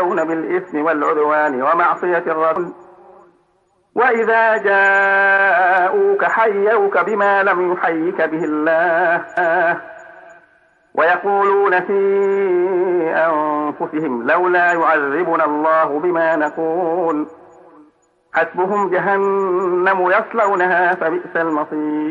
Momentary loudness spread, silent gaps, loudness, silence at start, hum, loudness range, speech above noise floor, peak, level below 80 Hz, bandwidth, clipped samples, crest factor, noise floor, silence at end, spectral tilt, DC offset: 7 LU; none; -16 LUFS; 0 s; none; 5 LU; 45 dB; -4 dBFS; -70 dBFS; 7.4 kHz; under 0.1%; 12 dB; -60 dBFS; 0 s; -6.5 dB/octave; under 0.1%